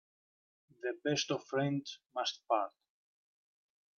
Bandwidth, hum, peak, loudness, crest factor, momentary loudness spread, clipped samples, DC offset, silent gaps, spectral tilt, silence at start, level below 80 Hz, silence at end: 7.4 kHz; none; -18 dBFS; -36 LUFS; 22 dB; 9 LU; under 0.1%; under 0.1%; none; -4.5 dB/octave; 0.85 s; -82 dBFS; 1.3 s